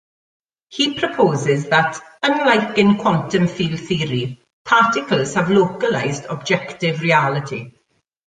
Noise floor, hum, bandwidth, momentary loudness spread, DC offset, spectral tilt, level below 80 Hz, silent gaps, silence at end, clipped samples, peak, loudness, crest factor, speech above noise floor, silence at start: -66 dBFS; none; 9.6 kHz; 9 LU; under 0.1%; -5 dB/octave; -56 dBFS; 4.53-4.65 s; 0.55 s; under 0.1%; -2 dBFS; -18 LUFS; 18 dB; 48 dB; 0.7 s